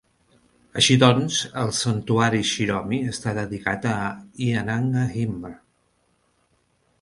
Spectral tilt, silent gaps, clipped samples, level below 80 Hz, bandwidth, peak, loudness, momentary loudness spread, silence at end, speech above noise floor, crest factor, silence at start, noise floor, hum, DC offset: -4.5 dB/octave; none; under 0.1%; -54 dBFS; 11.5 kHz; -2 dBFS; -22 LUFS; 11 LU; 1.45 s; 44 dB; 22 dB; 0.75 s; -67 dBFS; none; under 0.1%